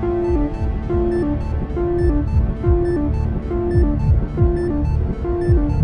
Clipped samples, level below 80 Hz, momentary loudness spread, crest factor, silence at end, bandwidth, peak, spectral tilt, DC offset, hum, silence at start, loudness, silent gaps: under 0.1%; -22 dBFS; 4 LU; 14 dB; 0 s; 5.6 kHz; -4 dBFS; -10.5 dB/octave; under 0.1%; none; 0 s; -20 LUFS; none